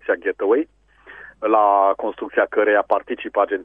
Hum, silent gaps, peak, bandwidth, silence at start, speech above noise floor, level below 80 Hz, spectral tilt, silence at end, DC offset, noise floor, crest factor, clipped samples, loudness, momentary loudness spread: none; none; -4 dBFS; 3.7 kHz; 0.05 s; 25 dB; -60 dBFS; -6.5 dB/octave; 0 s; under 0.1%; -43 dBFS; 16 dB; under 0.1%; -19 LUFS; 9 LU